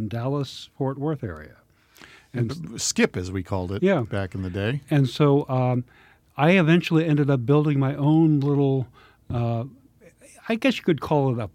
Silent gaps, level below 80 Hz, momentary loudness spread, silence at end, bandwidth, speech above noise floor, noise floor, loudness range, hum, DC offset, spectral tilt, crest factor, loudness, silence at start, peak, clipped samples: none; -58 dBFS; 13 LU; 0.05 s; 15 kHz; 30 dB; -52 dBFS; 7 LU; none; under 0.1%; -6.5 dB/octave; 18 dB; -23 LUFS; 0 s; -4 dBFS; under 0.1%